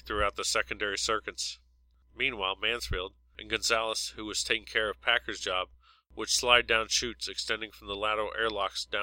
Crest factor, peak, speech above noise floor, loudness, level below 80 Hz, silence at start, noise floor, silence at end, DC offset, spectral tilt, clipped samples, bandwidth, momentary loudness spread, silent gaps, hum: 26 dB; -6 dBFS; 33 dB; -29 LUFS; -50 dBFS; 0.05 s; -64 dBFS; 0 s; under 0.1%; -1 dB/octave; under 0.1%; 16.5 kHz; 10 LU; none; none